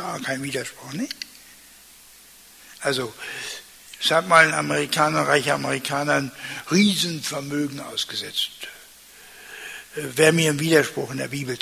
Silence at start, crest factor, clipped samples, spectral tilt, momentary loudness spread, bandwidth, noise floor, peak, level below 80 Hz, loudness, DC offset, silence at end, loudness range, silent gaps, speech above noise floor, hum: 0 s; 22 dB; under 0.1%; -3.5 dB/octave; 18 LU; 16 kHz; -49 dBFS; -2 dBFS; -64 dBFS; -22 LUFS; under 0.1%; 0 s; 10 LU; none; 26 dB; none